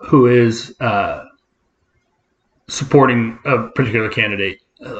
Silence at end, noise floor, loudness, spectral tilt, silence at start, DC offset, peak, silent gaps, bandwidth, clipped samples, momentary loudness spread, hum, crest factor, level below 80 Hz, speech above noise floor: 0 s; -66 dBFS; -16 LUFS; -6 dB/octave; 0 s; under 0.1%; 0 dBFS; none; 8.8 kHz; under 0.1%; 13 LU; none; 16 dB; -50 dBFS; 51 dB